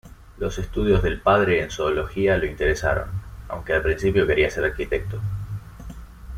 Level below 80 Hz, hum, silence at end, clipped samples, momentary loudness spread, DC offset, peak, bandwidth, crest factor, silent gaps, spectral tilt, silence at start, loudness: -34 dBFS; none; 0 s; under 0.1%; 16 LU; under 0.1%; -4 dBFS; 15 kHz; 18 dB; none; -6 dB/octave; 0.05 s; -22 LUFS